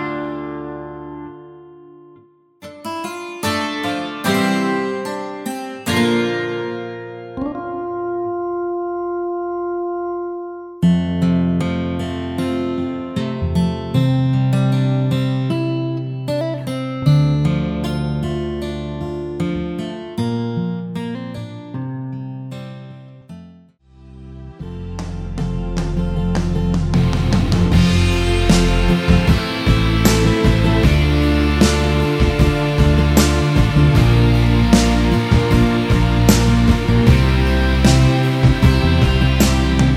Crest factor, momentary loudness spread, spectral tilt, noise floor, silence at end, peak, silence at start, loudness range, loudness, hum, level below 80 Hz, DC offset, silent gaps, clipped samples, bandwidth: 16 dB; 14 LU; -6 dB/octave; -49 dBFS; 0 s; 0 dBFS; 0 s; 13 LU; -17 LUFS; none; -24 dBFS; under 0.1%; none; under 0.1%; 16 kHz